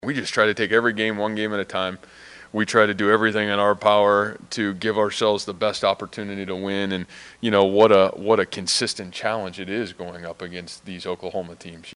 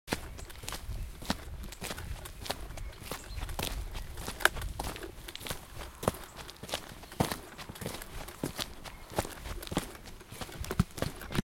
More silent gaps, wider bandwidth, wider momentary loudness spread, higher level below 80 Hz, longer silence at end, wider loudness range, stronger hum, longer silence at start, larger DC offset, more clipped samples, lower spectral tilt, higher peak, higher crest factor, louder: neither; second, 11.5 kHz vs 17 kHz; first, 16 LU vs 11 LU; second, -62 dBFS vs -44 dBFS; about the same, 0 s vs 0.1 s; about the same, 5 LU vs 4 LU; neither; about the same, 0.05 s vs 0.05 s; neither; neither; about the same, -4 dB/octave vs -4 dB/octave; first, 0 dBFS vs -4 dBFS; second, 22 dB vs 32 dB; first, -21 LUFS vs -38 LUFS